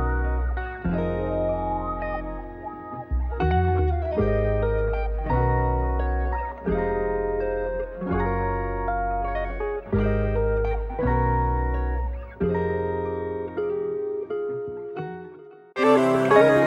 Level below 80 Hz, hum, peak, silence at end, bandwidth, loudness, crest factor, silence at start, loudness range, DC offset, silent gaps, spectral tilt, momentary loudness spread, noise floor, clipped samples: -30 dBFS; none; -4 dBFS; 0 s; 10 kHz; -25 LUFS; 20 dB; 0 s; 4 LU; under 0.1%; none; -8.5 dB/octave; 10 LU; -45 dBFS; under 0.1%